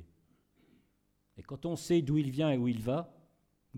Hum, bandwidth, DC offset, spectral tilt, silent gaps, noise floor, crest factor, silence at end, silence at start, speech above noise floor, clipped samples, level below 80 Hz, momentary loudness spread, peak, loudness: 50 Hz at -60 dBFS; 15.5 kHz; under 0.1%; -7 dB/octave; none; -75 dBFS; 16 dB; 0 s; 0 s; 43 dB; under 0.1%; -62 dBFS; 13 LU; -18 dBFS; -32 LUFS